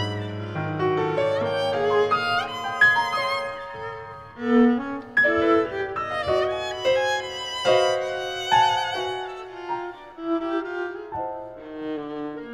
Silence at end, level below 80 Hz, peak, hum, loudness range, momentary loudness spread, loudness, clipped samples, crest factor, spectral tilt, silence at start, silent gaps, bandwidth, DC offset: 0 s; -56 dBFS; -8 dBFS; none; 5 LU; 14 LU; -24 LUFS; under 0.1%; 16 dB; -4.5 dB/octave; 0 s; none; 13.5 kHz; under 0.1%